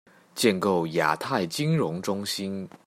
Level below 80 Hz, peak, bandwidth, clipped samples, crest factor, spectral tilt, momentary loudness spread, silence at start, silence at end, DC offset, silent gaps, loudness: -68 dBFS; -8 dBFS; 16 kHz; under 0.1%; 20 dB; -5 dB/octave; 7 LU; 0.35 s; 0.2 s; under 0.1%; none; -26 LUFS